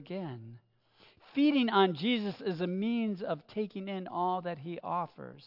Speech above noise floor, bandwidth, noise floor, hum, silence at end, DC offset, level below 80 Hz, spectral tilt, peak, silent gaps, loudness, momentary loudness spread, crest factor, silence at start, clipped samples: 32 dB; 5.8 kHz; -64 dBFS; none; 0 s; under 0.1%; -82 dBFS; -8.5 dB/octave; -14 dBFS; none; -32 LUFS; 13 LU; 18 dB; 0 s; under 0.1%